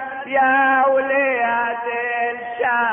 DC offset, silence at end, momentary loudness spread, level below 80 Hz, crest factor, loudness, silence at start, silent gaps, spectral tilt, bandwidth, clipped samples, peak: under 0.1%; 0 s; 8 LU; -64 dBFS; 12 dB; -18 LUFS; 0 s; none; -7 dB/octave; 3.6 kHz; under 0.1%; -6 dBFS